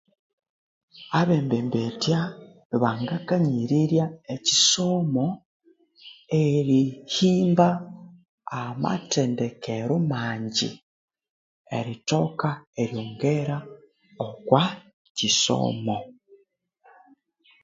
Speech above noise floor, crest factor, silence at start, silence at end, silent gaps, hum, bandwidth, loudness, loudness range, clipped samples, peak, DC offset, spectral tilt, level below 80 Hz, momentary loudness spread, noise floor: 41 dB; 22 dB; 0.95 s; 1.5 s; 2.65-2.70 s, 5.45-5.60 s, 8.29-8.38 s, 10.82-11.08 s, 11.30-11.65 s, 12.67-12.73 s, 14.93-15.15 s; none; 7.8 kHz; -24 LUFS; 5 LU; under 0.1%; -2 dBFS; under 0.1%; -4.5 dB/octave; -64 dBFS; 13 LU; -64 dBFS